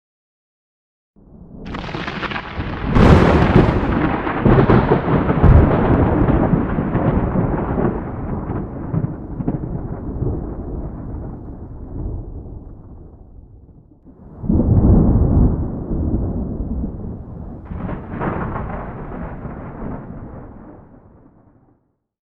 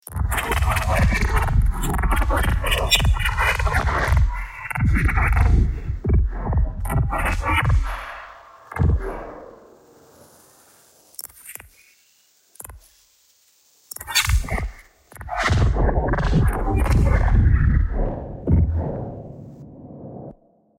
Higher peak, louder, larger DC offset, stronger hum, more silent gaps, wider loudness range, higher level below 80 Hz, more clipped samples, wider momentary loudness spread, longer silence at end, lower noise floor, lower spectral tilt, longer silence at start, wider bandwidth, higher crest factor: about the same, 0 dBFS vs -2 dBFS; first, -18 LUFS vs -21 LUFS; neither; neither; neither; second, 17 LU vs 20 LU; about the same, -26 dBFS vs -24 dBFS; neither; about the same, 20 LU vs 20 LU; first, 1.45 s vs 0.45 s; about the same, -62 dBFS vs -59 dBFS; first, -9.5 dB/octave vs -5 dB/octave; first, 1.35 s vs 0.1 s; second, 7.4 kHz vs 16.5 kHz; about the same, 18 dB vs 20 dB